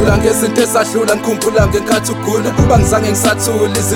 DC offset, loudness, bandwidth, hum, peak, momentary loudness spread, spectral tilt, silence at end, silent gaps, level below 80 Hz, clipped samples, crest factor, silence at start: under 0.1%; -13 LUFS; 17.5 kHz; none; 0 dBFS; 4 LU; -4.5 dB/octave; 0 s; none; -26 dBFS; under 0.1%; 12 dB; 0 s